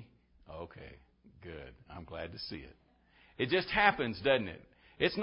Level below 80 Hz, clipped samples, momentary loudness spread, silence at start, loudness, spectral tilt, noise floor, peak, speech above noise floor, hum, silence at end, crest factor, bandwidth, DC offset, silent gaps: -58 dBFS; under 0.1%; 24 LU; 0 s; -32 LUFS; -8 dB/octave; -65 dBFS; -10 dBFS; 31 dB; none; 0 s; 26 dB; 5.6 kHz; under 0.1%; none